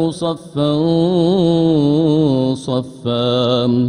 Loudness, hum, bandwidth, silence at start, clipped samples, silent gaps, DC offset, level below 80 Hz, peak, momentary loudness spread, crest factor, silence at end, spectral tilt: -16 LUFS; none; 10.5 kHz; 0 s; under 0.1%; none; under 0.1%; -50 dBFS; -4 dBFS; 7 LU; 12 dB; 0 s; -7.5 dB/octave